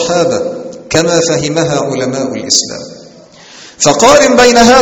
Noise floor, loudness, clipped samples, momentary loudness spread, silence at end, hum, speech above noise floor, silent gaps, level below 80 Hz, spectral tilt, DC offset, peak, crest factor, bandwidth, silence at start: -36 dBFS; -9 LUFS; 1%; 15 LU; 0 s; none; 27 dB; none; -38 dBFS; -3 dB/octave; under 0.1%; 0 dBFS; 10 dB; 19.5 kHz; 0 s